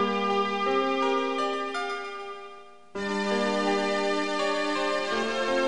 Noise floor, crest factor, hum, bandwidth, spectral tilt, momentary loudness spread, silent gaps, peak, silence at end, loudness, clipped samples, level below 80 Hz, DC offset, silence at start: -48 dBFS; 14 dB; none; 11 kHz; -4 dB/octave; 11 LU; none; -12 dBFS; 0 s; -27 LUFS; under 0.1%; -66 dBFS; 0.5%; 0 s